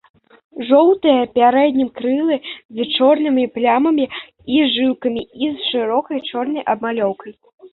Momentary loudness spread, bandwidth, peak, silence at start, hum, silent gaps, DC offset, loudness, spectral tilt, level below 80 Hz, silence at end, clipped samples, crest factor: 11 LU; 4.3 kHz; -2 dBFS; 0.55 s; none; 2.65-2.69 s, 7.54-7.58 s; under 0.1%; -17 LUFS; -9 dB/octave; -60 dBFS; 0.05 s; under 0.1%; 16 dB